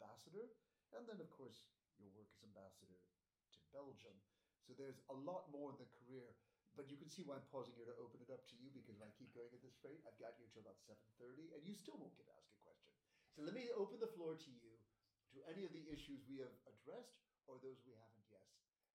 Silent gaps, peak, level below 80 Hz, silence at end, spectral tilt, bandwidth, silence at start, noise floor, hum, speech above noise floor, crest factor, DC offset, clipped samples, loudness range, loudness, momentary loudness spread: none; -36 dBFS; -86 dBFS; 0.35 s; -5.5 dB/octave; 15 kHz; 0 s; -83 dBFS; none; 26 dB; 22 dB; under 0.1%; under 0.1%; 10 LU; -57 LUFS; 14 LU